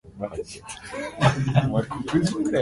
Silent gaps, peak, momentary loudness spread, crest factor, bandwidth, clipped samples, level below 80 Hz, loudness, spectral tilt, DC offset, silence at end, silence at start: none; -6 dBFS; 13 LU; 20 dB; 11.5 kHz; under 0.1%; -48 dBFS; -24 LUFS; -6.5 dB/octave; under 0.1%; 0 s; 0.05 s